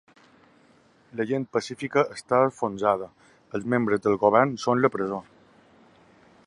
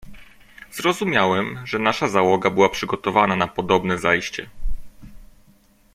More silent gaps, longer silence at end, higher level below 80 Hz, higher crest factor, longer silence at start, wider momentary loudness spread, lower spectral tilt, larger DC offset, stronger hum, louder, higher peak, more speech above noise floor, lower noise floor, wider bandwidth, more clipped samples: neither; first, 1.25 s vs 0.7 s; second, -66 dBFS vs -38 dBFS; about the same, 22 dB vs 20 dB; first, 1.15 s vs 0.05 s; second, 13 LU vs 16 LU; first, -6.5 dB/octave vs -5 dB/octave; neither; neither; second, -25 LUFS vs -20 LUFS; about the same, -4 dBFS vs -2 dBFS; about the same, 35 dB vs 35 dB; first, -59 dBFS vs -55 dBFS; second, 11 kHz vs 16 kHz; neither